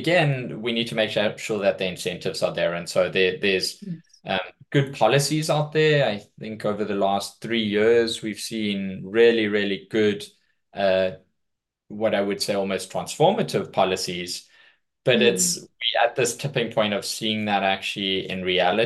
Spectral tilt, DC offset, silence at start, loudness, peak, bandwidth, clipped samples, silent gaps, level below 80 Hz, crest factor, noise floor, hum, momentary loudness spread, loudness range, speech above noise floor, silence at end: -4 dB/octave; under 0.1%; 0 s; -23 LUFS; -6 dBFS; 12.5 kHz; under 0.1%; none; -68 dBFS; 18 dB; -80 dBFS; none; 9 LU; 2 LU; 57 dB; 0 s